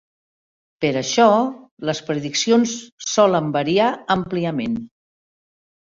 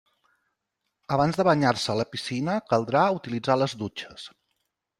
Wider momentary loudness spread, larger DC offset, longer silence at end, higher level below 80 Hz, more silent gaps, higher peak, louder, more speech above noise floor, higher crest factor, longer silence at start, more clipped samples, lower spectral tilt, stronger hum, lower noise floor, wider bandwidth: second, 11 LU vs 15 LU; neither; first, 1 s vs 0.7 s; about the same, -58 dBFS vs -60 dBFS; first, 1.71-1.77 s, 2.92-2.98 s vs none; first, -2 dBFS vs -6 dBFS; first, -20 LUFS vs -25 LUFS; first, over 71 dB vs 56 dB; about the same, 18 dB vs 20 dB; second, 0.8 s vs 1.1 s; neither; about the same, -4.5 dB/octave vs -5.5 dB/octave; neither; first, under -90 dBFS vs -81 dBFS; second, 7.8 kHz vs 12.5 kHz